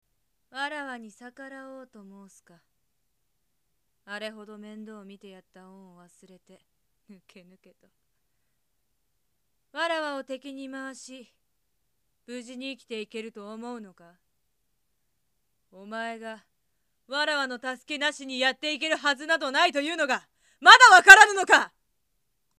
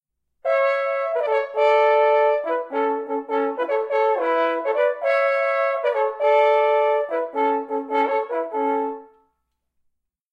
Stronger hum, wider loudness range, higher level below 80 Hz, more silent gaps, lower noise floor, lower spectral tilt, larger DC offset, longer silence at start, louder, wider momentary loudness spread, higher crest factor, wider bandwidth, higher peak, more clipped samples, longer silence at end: neither; first, 28 LU vs 3 LU; first, -68 dBFS vs -78 dBFS; neither; first, -79 dBFS vs -74 dBFS; second, 0 dB/octave vs -3 dB/octave; neither; about the same, 0.55 s vs 0.45 s; about the same, -19 LUFS vs -21 LUFS; first, 30 LU vs 8 LU; first, 26 dB vs 14 dB; first, 15.5 kHz vs 6.8 kHz; first, 0 dBFS vs -6 dBFS; neither; second, 0.9 s vs 1.25 s